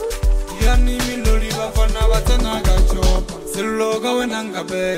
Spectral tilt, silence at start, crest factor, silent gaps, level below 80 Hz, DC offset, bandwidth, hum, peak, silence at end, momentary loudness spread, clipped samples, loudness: -5 dB/octave; 0 s; 14 dB; none; -18 dBFS; under 0.1%; 15.5 kHz; none; -2 dBFS; 0 s; 6 LU; under 0.1%; -19 LUFS